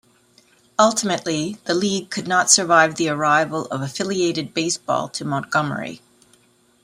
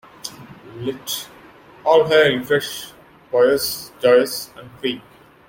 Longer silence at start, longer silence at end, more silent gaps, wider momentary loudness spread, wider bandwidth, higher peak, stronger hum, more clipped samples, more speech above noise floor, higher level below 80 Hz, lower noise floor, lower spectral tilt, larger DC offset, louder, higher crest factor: first, 0.8 s vs 0.25 s; first, 0.85 s vs 0.5 s; neither; second, 11 LU vs 19 LU; about the same, 16 kHz vs 17 kHz; about the same, 0 dBFS vs -2 dBFS; neither; neither; first, 37 dB vs 27 dB; second, -64 dBFS vs -58 dBFS; first, -57 dBFS vs -45 dBFS; about the same, -3 dB/octave vs -3.5 dB/octave; neither; about the same, -20 LUFS vs -19 LUFS; about the same, 22 dB vs 18 dB